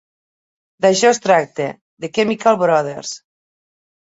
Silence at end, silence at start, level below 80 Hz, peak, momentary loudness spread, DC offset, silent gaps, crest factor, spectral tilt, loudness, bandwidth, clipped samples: 1 s; 0.8 s; -64 dBFS; -2 dBFS; 16 LU; under 0.1%; 1.81-1.97 s; 18 dB; -4 dB/octave; -16 LUFS; 8 kHz; under 0.1%